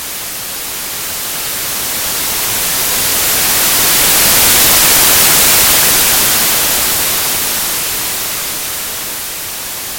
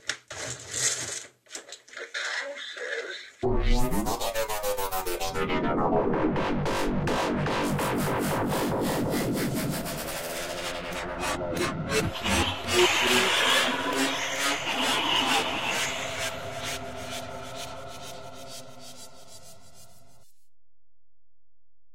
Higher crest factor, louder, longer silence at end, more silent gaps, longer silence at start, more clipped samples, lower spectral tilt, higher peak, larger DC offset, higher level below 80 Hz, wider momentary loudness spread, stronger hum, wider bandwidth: second, 12 dB vs 20 dB; first, -9 LUFS vs -27 LUFS; about the same, 0 s vs 0 s; neither; about the same, 0 s vs 0 s; neither; second, 0 dB/octave vs -3 dB/octave; first, 0 dBFS vs -8 dBFS; neither; about the same, -36 dBFS vs -40 dBFS; second, 13 LU vs 18 LU; neither; first, over 20 kHz vs 16 kHz